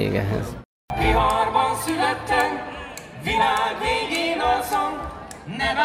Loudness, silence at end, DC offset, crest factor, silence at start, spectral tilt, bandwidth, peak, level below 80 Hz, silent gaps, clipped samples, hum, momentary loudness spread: -22 LUFS; 0 s; under 0.1%; 18 dB; 0 s; -4.5 dB/octave; 16 kHz; -6 dBFS; -36 dBFS; 0.65-0.88 s; under 0.1%; none; 15 LU